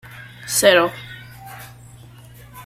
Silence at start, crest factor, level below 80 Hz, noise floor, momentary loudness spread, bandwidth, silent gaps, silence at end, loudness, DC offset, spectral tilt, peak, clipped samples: 0.05 s; 20 dB; -54 dBFS; -43 dBFS; 25 LU; 16 kHz; none; 0.05 s; -16 LUFS; under 0.1%; -2 dB/octave; -2 dBFS; under 0.1%